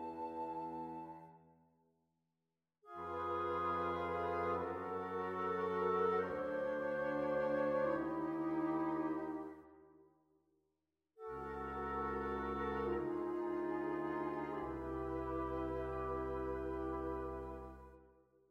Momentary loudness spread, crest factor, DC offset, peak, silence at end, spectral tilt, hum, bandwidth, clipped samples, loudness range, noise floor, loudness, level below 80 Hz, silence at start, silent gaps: 11 LU; 16 dB; under 0.1%; -24 dBFS; 0.45 s; -8 dB/octave; none; 7.4 kHz; under 0.1%; 8 LU; under -90 dBFS; -40 LUFS; -58 dBFS; 0 s; none